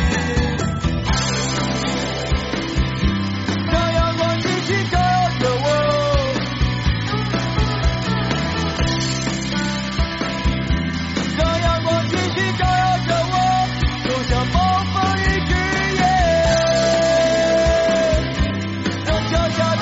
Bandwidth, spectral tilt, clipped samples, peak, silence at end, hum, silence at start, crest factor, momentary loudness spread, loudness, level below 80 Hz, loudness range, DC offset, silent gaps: 8 kHz; -4 dB/octave; under 0.1%; -6 dBFS; 0 s; none; 0 s; 12 dB; 6 LU; -19 LUFS; -28 dBFS; 4 LU; under 0.1%; none